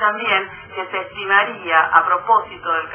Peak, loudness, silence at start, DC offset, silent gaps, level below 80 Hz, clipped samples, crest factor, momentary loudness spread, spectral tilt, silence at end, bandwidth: 0 dBFS; -17 LUFS; 0 s; under 0.1%; none; -58 dBFS; under 0.1%; 18 dB; 11 LU; -6 dB/octave; 0 s; 3.4 kHz